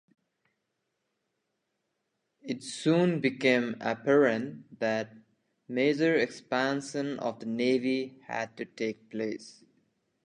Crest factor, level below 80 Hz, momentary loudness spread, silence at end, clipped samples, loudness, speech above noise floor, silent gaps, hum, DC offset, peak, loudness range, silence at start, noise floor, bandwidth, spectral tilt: 20 dB; -80 dBFS; 12 LU; 0.75 s; under 0.1%; -29 LUFS; 52 dB; none; none; under 0.1%; -10 dBFS; 5 LU; 2.45 s; -81 dBFS; 11 kHz; -5.5 dB/octave